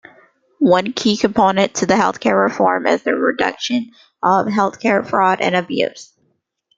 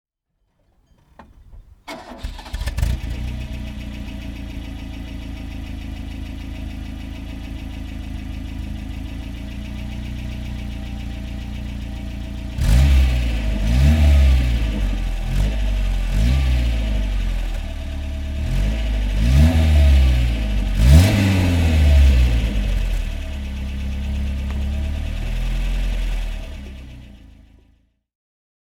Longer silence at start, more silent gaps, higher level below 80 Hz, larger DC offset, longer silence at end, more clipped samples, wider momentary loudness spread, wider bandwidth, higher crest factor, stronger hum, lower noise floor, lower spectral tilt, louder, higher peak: second, 0.6 s vs 1.2 s; neither; second, -56 dBFS vs -20 dBFS; neither; second, 0.75 s vs 1.35 s; neither; second, 6 LU vs 17 LU; second, 9 kHz vs 15 kHz; about the same, 16 dB vs 18 dB; neither; second, -66 dBFS vs -70 dBFS; second, -4.5 dB/octave vs -6.5 dB/octave; first, -16 LUFS vs -21 LUFS; about the same, 0 dBFS vs 0 dBFS